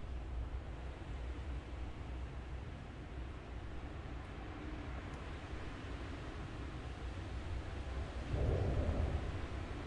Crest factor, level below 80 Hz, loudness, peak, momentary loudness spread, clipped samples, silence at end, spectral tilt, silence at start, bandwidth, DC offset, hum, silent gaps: 20 dB; -46 dBFS; -44 LUFS; -22 dBFS; 10 LU; under 0.1%; 0 s; -7 dB/octave; 0 s; 10 kHz; under 0.1%; none; none